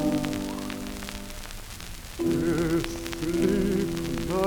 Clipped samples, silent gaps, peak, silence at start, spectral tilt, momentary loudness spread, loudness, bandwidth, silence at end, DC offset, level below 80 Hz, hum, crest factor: under 0.1%; none; -8 dBFS; 0 s; -5.5 dB/octave; 14 LU; -28 LUFS; over 20 kHz; 0 s; under 0.1%; -40 dBFS; none; 20 dB